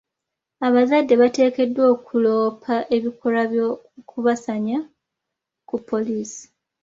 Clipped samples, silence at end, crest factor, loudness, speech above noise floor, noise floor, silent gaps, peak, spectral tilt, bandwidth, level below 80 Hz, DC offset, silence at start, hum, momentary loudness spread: under 0.1%; 0.4 s; 16 dB; -20 LUFS; 64 dB; -83 dBFS; none; -4 dBFS; -5.5 dB/octave; 7.8 kHz; -66 dBFS; under 0.1%; 0.6 s; none; 14 LU